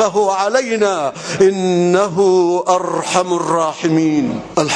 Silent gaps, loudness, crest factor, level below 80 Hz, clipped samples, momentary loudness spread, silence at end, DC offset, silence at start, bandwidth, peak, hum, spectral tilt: none; -15 LUFS; 14 dB; -56 dBFS; under 0.1%; 5 LU; 0 s; under 0.1%; 0 s; 10.5 kHz; 0 dBFS; none; -5 dB/octave